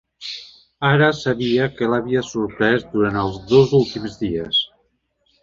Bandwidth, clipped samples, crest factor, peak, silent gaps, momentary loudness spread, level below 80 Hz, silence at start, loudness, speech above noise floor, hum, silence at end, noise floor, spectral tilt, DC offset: 7.6 kHz; under 0.1%; 18 dB; -2 dBFS; none; 13 LU; -48 dBFS; 0.2 s; -19 LUFS; 48 dB; none; 0.75 s; -66 dBFS; -6 dB/octave; under 0.1%